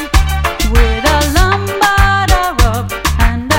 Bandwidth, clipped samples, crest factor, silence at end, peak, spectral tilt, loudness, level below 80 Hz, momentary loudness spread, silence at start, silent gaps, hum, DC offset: 17 kHz; 0.3%; 12 dB; 0 s; 0 dBFS; -4.5 dB/octave; -12 LUFS; -14 dBFS; 5 LU; 0 s; none; none; under 0.1%